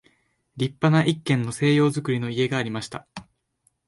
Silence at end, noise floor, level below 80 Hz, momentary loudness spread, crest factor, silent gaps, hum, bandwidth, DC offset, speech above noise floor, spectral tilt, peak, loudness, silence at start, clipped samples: 0.65 s; -69 dBFS; -60 dBFS; 16 LU; 18 dB; none; none; 11.5 kHz; under 0.1%; 47 dB; -6 dB/octave; -6 dBFS; -23 LUFS; 0.55 s; under 0.1%